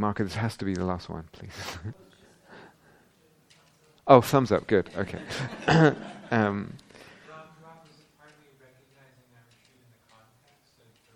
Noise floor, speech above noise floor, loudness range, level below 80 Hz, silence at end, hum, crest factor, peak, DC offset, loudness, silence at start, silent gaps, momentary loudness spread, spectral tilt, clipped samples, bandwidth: -63 dBFS; 38 dB; 13 LU; -58 dBFS; 3.45 s; none; 28 dB; 0 dBFS; under 0.1%; -25 LUFS; 0 s; none; 24 LU; -6.5 dB/octave; under 0.1%; 15.5 kHz